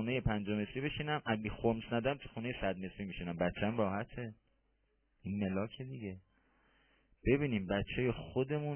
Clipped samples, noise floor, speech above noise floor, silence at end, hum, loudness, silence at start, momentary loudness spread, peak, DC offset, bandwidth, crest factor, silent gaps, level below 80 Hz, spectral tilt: under 0.1%; -77 dBFS; 40 dB; 0 s; none; -37 LUFS; 0 s; 10 LU; -18 dBFS; under 0.1%; 3.3 kHz; 20 dB; none; -54 dBFS; -5.5 dB/octave